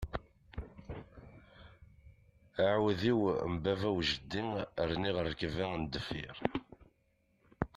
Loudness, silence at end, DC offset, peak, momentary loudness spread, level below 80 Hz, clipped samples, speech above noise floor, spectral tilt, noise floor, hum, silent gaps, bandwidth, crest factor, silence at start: -35 LUFS; 0.1 s; under 0.1%; -12 dBFS; 18 LU; -54 dBFS; under 0.1%; 40 dB; -6.5 dB/octave; -74 dBFS; none; none; 13 kHz; 24 dB; 0 s